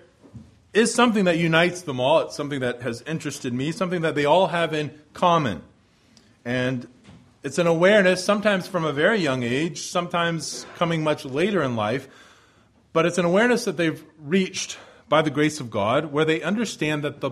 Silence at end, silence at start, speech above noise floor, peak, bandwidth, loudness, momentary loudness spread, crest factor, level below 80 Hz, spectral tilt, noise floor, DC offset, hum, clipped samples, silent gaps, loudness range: 0 s; 0.35 s; 35 dB; -4 dBFS; 14.5 kHz; -22 LUFS; 10 LU; 20 dB; -60 dBFS; -5 dB/octave; -58 dBFS; under 0.1%; none; under 0.1%; none; 4 LU